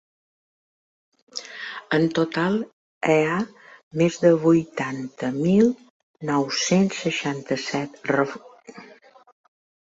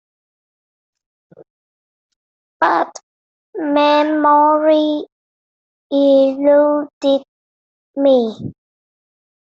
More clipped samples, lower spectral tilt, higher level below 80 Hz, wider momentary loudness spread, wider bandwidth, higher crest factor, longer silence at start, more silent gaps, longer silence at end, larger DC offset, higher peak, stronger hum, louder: neither; about the same, -5.5 dB/octave vs -5.5 dB/octave; about the same, -64 dBFS vs -64 dBFS; first, 16 LU vs 13 LU; about the same, 8 kHz vs 7.6 kHz; about the same, 20 dB vs 16 dB; second, 1.35 s vs 2.6 s; second, 2.73-3.01 s, 3.83-3.91 s, 5.90-6.14 s vs 3.03-3.53 s, 5.12-5.90 s, 6.93-7.01 s, 7.28-7.94 s; about the same, 1.05 s vs 1.05 s; neither; about the same, -4 dBFS vs -2 dBFS; neither; second, -23 LUFS vs -15 LUFS